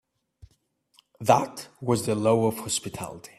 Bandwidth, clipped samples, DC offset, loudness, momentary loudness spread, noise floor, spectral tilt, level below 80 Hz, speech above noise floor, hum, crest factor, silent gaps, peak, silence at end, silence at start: 15.5 kHz; under 0.1%; under 0.1%; -25 LUFS; 13 LU; -68 dBFS; -5 dB/octave; -62 dBFS; 43 dB; none; 22 dB; none; -4 dBFS; 0.1 s; 1.2 s